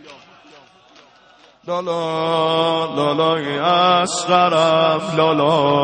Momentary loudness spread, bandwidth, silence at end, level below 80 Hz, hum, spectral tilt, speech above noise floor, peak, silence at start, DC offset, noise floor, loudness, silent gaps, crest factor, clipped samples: 8 LU; 9.4 kHz; 0 s; -62 dBFS; none; -4.5 dB/octave; 33 dB; -2 dBFS; 0.05 s; under 0.1%; -50 dBFS; -17 LUFS; none; 16 dB; under 0.1%